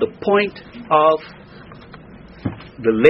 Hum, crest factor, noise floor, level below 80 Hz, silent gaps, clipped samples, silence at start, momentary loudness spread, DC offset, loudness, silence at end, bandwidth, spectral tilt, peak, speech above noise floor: none; 18 dB; -40 dBFS; -50 dBFS; none; under 0.1%; 0 s; 25 LU; under 0.1%; -19 LUFS; 0 s; 5.8 kHz; -4 dB/octave; 0 dBFS; 25 dB